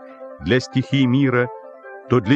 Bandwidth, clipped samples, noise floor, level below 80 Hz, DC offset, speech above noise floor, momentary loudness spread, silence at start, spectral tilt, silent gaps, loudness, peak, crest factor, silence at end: 8.2 kHz; under 0.1%; -38 dBFS; -50 dBFS; under 0.1%; 21 dB; 21 LU; 0 s; -7 dB/octave; none; -19 LUFS; -4 dBFS; 16 dB; 0 s